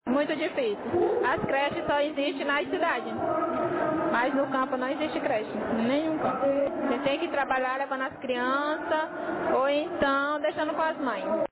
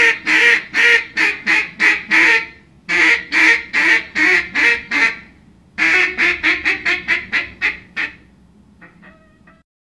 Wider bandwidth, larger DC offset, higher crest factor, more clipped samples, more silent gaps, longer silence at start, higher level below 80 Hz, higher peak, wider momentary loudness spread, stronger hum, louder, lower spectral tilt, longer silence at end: second, 4 kHz vs 12 kHz; neither; about the same, 12 dB vs 16 dB; neither; neither; about the same, 0.05 s vs 0 s; second, -60 dBFS vs -50 dBFS; second, -14 dBFS vs 0 dBFS; second, 4 LU vs 9 LU; neither; second, -27 LUFS vs -13 LUFS; first, -9 dB/octave vs -1.5 dB/octave; second, 0.05 s vs 1.15 s